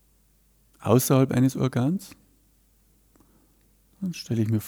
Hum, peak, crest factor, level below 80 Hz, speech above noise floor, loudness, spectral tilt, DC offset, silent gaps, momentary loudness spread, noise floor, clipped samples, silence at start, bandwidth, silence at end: none; -6 dBFS; 20 dB; -60 dBFS; 39 dB; -24 LUFS; -6.5 dB/octave; under 0.1%; none; 15 LU; -62 dBFS; under 0.1%; 0.8 s; over 20 kHz; 0 s